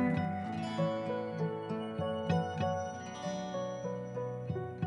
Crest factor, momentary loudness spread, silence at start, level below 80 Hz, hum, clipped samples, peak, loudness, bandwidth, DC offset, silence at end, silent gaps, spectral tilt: 16 dB; 6 LU; 0 s; -66 dBFS; none; under 0.1%; -20 dBFS; -36 LUFS; 10.5 kHz; under 0.1%; 0 s; none; -7 dB/octave